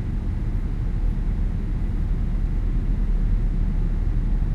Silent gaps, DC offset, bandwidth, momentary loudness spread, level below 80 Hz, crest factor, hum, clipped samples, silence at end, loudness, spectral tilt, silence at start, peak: none; under 0.1%; 3 kHz; 2 LU; -22 dBFS; 10 dB; none; under 0.1%; 0 s; -27 LUFS; -9.5 dB/octave; 0 s; -10 dBFS